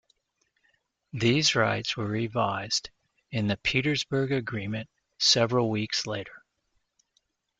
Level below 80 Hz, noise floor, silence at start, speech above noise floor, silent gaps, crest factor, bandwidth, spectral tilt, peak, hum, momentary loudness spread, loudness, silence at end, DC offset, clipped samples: -60 dBFS; -75 dBFS; 1.15 s; 48 dB; none; 20 dB; 9.4 kHz; -4 dB/octave; -10 dBFS; none; 14 LU; -27 LUFS; 1.2 s; under 0.1%; under 0.1%